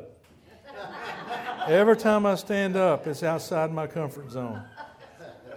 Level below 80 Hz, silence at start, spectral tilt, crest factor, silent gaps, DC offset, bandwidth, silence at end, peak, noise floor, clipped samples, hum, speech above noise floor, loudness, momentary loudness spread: -66 dBFS; 0 s; -6 dB/octave; 18 dB; none; under 0.1%; over 20 kHz; 0 s; -8 dBFS; -54 dBFS; under 0.1%; none; 30 dB; -26 LUFS; 24 LU